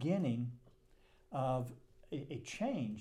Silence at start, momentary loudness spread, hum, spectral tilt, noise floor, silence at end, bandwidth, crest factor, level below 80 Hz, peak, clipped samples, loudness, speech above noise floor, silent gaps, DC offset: 0 s; 11 LU; none; -7 dB/octave; -67 dBFS; 0 s; 13 kHz; 16 dB; -66 dBFS; -24 dBFS; under 0.1%; -40 LUFS; 29 dB; none; under 0.1%